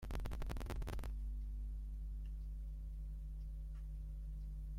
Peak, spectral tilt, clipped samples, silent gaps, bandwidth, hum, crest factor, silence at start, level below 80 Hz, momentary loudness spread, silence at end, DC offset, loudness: -30 dBFS; -6.5 dB/octave; under 0.1%; none; 15 kHz; none; 14 dB; 0 s; -44 dBFS; 4 LU; 0 s; under 0.1%; -49 LUFS